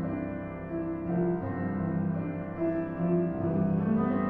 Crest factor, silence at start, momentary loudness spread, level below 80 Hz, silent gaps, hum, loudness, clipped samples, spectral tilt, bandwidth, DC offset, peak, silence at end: 14 dB; 0 s; 8 LU; -54 dBFS; none; none; -31 LUFS; under 0.1%; -12.5 dB/octave; 3.3 kHz; under 0.1%; -16 dBFS; 0 s